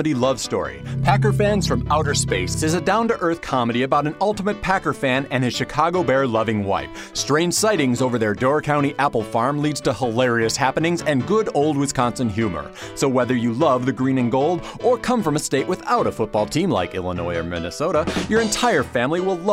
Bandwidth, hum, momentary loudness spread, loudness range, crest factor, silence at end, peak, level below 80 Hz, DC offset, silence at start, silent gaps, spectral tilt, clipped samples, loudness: 16 kHz; none; 5 LU; 1 LU; 18 dB; 0 s; -2 dBFS; -42 dBFS; under 0.1%; 0 s; none; -5 dB/octave; under 0.1%; -20 LUFS